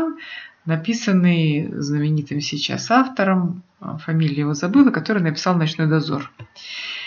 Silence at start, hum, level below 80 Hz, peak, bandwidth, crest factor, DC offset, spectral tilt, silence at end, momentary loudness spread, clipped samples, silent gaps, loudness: 0 s; none; -66 dBFS; -2 dBFS; 7.2 kHz; 18 dB; under 0.1%; -6 dB/octave; 0 s; 16 LU; under 0.1%; none; -20 LUFS